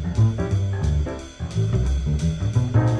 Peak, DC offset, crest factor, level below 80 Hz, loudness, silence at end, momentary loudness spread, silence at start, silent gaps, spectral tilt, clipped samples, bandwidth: -8 dBFS; under 0.1%; 14 dB; -28 dBFS; -23 LUFS; 0 s; 7 LU; 0 s; none; -7.5 dB/octave; under 0.1%; 9.2 kHz